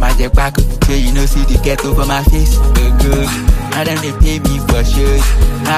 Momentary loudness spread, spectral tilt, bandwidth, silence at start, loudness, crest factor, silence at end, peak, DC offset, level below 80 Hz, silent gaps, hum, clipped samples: 3 LU; -5 dB/octave; 15.5 kHz; 0 s; -14 LUFS; 10 dB; 0 s; 0 dBFS; under 0.1%; -12 dBFS; none; none; under 0.1%